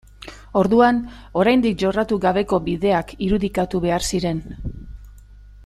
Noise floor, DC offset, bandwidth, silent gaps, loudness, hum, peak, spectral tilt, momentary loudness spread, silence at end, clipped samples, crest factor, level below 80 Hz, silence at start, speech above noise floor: -43 dBFS; under 0.1%; 13.5 kHz; none; -20 LUFS; 50 Hz at -40 dBFS; -2 dBFS; -6 dB/octave; 17 LU; 0.05 s; under 0.1%; 18 dB; -38 dBFS; 0.2 s; 24 dB